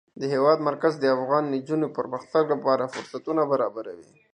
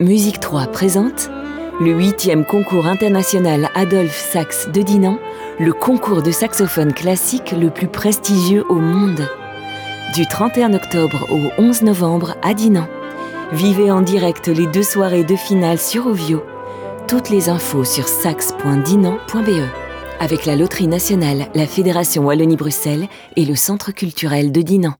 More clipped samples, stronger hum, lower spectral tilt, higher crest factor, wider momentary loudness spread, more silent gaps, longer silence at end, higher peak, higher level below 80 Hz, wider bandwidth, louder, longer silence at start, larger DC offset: neither; neither; first, -6.5 dB/octave vs -5 dB/octave; first, 18 dB vs 12 dB; about the same, 10 LU vs 9 LU; neither; first, 0.3 s vs 0.05 s; second, -8 dBFS vs -4 dBFS; second, -76 dBFS vs -48 dBFS; second, 10 kHz vs over 20 kHz; second, -25 LUFS vs -15 LUFS; first, 0.15 s vs 0 s; neither